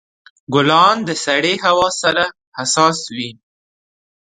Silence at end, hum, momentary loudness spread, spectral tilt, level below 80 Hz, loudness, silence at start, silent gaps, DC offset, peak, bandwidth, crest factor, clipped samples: 1 s; none; 12 LU; -3 dB/octave; -56 dBFS; -15 LUFS; 0.5 s; 2.47-2.52 s; under 0.1%; 0 dBFS; 9.6 kHz; 18 dB; under 0.1%